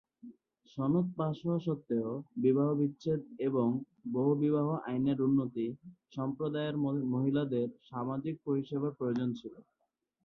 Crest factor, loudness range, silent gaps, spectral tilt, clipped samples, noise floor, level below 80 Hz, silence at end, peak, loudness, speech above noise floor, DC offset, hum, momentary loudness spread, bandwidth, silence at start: 16 dB; 3 LU; none; -10 dB/octave; under 0.1%; -82 dBFS; -72 dBFS; 0.65 s; -16 dBFS; -33 LUFS; 49 dB; under 0.1%; none; 9 LU; 6.2 kHz; 0.25 s